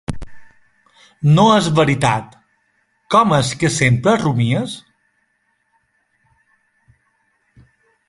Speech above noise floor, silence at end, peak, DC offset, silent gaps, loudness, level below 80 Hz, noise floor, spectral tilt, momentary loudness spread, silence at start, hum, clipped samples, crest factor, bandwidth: 51 dB; 3.3 s; 0 dBFS; under 0.1%; none; -15 LUFS; -46 dBFS; -66 dBFS; -5.5 dB/octave; 14 LU; 0.1 s; none; under 0.1%; 18 dB; 11.5 kHz